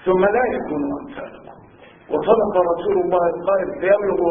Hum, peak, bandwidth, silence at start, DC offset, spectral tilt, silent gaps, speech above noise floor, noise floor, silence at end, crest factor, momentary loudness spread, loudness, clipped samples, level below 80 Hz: none; -2 dBFS; 3.7 kHz; 0 s; under 0.1%; -11.5 dB/octave; none; 27 dB; -46 dBFS; 0 s; 18 dB; 12 LU; -19 LUFS; under 0.1%; -50 dBFS